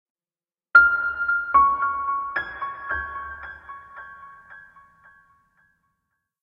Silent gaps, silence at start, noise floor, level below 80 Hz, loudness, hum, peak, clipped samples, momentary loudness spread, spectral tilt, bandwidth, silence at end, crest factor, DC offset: none; 0.75 s; under -90 dBFS; -54 dBFS; -21 LUFS; none; -2 dBFS; under 0.1%; 25 LU; -5 dB/octave; 5.4 kHz; 1.8 s; 22 dB; under 0.1%